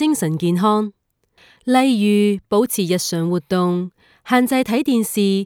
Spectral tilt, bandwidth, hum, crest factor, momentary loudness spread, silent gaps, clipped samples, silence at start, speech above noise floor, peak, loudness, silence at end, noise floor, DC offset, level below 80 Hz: -5.5 dB/octave; 20 kHz; none; 16 dB; 6 LU; none; under 0.1%; 0 s; 39 dB; -2 dBFS; -18 LUFS; 0 s; -56 dBFS; under 0.1%; -60 dBFS